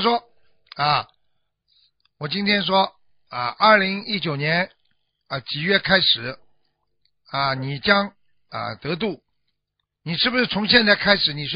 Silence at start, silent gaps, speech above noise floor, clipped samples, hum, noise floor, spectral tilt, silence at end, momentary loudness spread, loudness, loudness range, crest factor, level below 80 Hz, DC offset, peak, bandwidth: 0 s; none; 57 dB; under 0.1%; 50 Hz at -55 dBFS; -78 dBFS; -8.5 dB/octave; 0 s; 16 LU; -20 LUFS; 5 LU; 22 dB; -56 dBFS; under 0.1%; 0 dBFS; 5.4 kHz